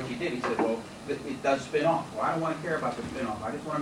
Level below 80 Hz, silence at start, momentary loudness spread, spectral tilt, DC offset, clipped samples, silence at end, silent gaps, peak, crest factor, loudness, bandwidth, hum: -58 dBFS; 0 s; 8 LU; -5.5 dB/octave; under 0.1%; under 0.1%; 0 s; none; -12 dBFS; 18 dB; -30 LUFS; 16 kHz; none